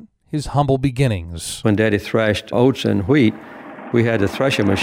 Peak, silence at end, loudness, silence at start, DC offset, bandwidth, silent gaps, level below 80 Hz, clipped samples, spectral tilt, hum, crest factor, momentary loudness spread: -4 dBFS; 0 s; -18 LUFS; 0 s; under 0.1%; 16 kHz; none; -42 dBFS; under 0.1%; -6 dB/octave; none; 14 dB; 11 LU